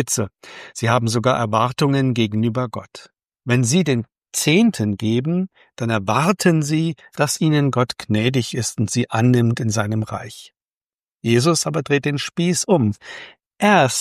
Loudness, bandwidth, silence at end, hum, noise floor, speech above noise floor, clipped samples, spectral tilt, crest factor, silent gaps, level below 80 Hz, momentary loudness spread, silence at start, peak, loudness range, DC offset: -19 LUFS; 15.5 kHz; 0 s; none; under -90 dBFS; over 71 dB; under 0.1%; -5 dB/octave; 18 dB; 10.77-10.99 s; -58 dBFS; 12 LU; 0 s; -2 dBFS; 2 LU; under 0.1%